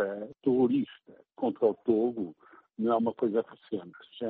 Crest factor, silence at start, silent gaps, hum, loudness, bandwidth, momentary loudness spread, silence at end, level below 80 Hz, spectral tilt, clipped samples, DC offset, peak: 16 dB; 0 s; none; none; -30 LUFS; 4.4 kHz; 13 LU; 0 s; -74 dBFS; -6.5 dB/octave; under 0.1%; under 0.1%; -14 dBFS